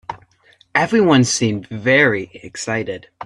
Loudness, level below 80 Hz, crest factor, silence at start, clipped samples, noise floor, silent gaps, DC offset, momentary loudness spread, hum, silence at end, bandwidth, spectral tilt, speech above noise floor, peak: -16 LUFS; -56 dBFS; 18 dB; 0.1 s; under 0.1%; -54 dBFS; none; under 0.1%; 16 LU; none; 0 s; 11.5 kHz; -4.5 dB/octave; 37 dB; 0 dBFS